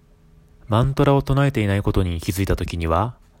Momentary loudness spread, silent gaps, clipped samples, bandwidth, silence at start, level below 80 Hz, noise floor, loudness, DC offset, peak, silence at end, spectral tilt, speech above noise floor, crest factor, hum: 6 LU; none; under 0.1%; 16.5 kHz; 0.65 s; -34 dBFS; -51 dBFS; -21 LUFS; under 0.1%; -4 dBFS; 0.3 s; -7 dB/octave; 32 dB; 16 dB; none